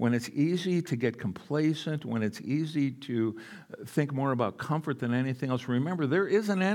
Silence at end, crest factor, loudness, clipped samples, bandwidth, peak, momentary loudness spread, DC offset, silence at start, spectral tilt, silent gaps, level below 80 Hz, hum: 0 s; 16 dB; -30 LUFS; under 0.1%; 17 kHz; -12 dBFS; 6 LU; under 0.1%; 0 s; -7 dB/octave; none; -78 dBFS; none